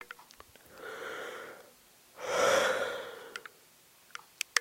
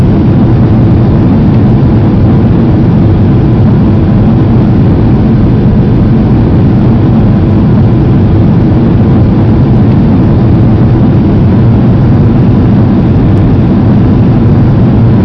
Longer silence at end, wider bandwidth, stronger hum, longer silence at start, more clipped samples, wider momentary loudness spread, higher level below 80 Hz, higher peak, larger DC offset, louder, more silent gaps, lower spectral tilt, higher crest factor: about the same, 0 s vs 0 s; first, 16.5 kHz vs 5.6 kHz; neither; about the same, 0 s vs 0 s; second, under 0.1% vs 3%; first, 26 LU vs 1 LU; second, -74 dBFS vs -16 dBFS; second, -8 dBFS vs 0 dBFS; neither; second, -33 LUFS vs -6 LUFS; neither; second, -1 dB/octave vs -11 dB/octave; first, 28 dB vs 4 dB